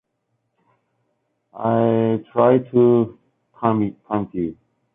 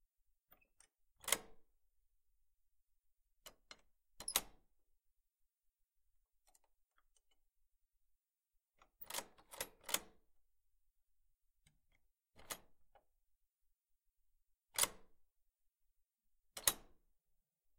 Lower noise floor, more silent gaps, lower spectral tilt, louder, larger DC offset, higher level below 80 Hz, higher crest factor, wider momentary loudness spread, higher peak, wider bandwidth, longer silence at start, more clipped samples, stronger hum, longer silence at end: second, -73 dBFS vs -87 dBFS; neither; first, -12 dB/octave vs 1 dB/octave; first, -19 LUFS vs -42 LUFS; neither; first, -58 dBFS vs -74 dBFS; second, 18 dB vs 38 dB; second, 11 LU vs 25 LU; first, -4 dBFS vs -14 dBFS; second, 3.8 kHz vs 16 kHz; first, 1.55 s vs 1.25 s; neither; neither; second, 0.4 s vs 0.95 s